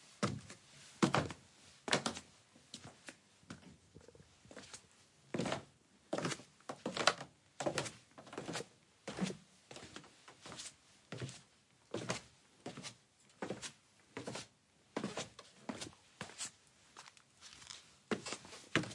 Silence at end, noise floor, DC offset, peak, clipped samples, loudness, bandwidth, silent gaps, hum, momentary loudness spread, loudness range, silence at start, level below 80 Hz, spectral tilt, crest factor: 0 s; -70 dBFS; under 0.1%; -12 dBFS; under 0.1%; -43 LUFS; 11.5 kHz; none; none; 21 LU; 8 LU; 0 s; -76 dBFS; -3.5 dB/octave; 34 dB